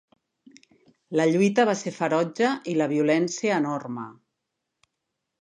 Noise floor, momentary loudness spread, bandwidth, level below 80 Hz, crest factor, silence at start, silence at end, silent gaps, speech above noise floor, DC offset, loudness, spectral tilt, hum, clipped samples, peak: -82 dBFS; 11 LU; 10 kHz; -78 dBFS; 18 dB; 1.1 s; 1.3 s; none; 58 dB; under 0.1%; -24 LUFS; -5.5 dB/octave; none; under 0.1%; -8 dBFS